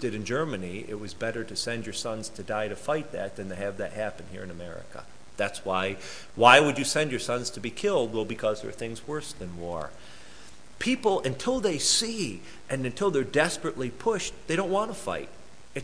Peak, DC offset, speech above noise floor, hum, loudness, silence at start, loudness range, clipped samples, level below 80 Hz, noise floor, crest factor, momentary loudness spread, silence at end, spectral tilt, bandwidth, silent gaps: -2 dBFS; 0.8%; 22 dB; none; -28 LUFS; 0 s; 9 LU; under 0.1%; -56 dBFS; -51 dBFS; 28 dB; 16 LU; 0 s; -3.5 dB/octave; 11 kHz; none